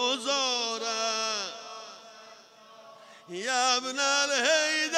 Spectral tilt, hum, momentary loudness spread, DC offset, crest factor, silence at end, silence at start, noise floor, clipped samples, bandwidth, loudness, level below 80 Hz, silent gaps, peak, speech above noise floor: 0.5 dB/octave; none; 19 LU; under 0.1%; 20 dB; 0 s; 0 s; -53 dBFS; under 0.1%; 16 kHz; -26 LUFS; under -90 dBFS; none; -10 dBFS; 26 dB